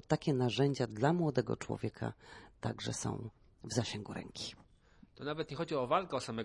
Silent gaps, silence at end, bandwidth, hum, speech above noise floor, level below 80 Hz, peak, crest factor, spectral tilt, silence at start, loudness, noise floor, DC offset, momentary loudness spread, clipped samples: none; 0 s; 11.5 kHz; none; 28 dB; -64 dBFS; -16 dBFS; 20 dB; -5.5 dB/octave; 0.1 s; -37 LUFS; -63 dBFS; under 0.1%; 13 LU; under 0.1%